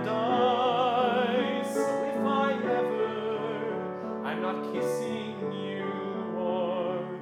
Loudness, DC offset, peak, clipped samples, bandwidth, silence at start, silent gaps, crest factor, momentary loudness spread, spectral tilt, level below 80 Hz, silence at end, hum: -29 LUFS; under 0.1%; -14 dBFS; under 0.1%; 15.5 kHz; 0 s; none; 14 dB; 8 LU; -5.5 dB/octave; -80 dBFS; 0 s; none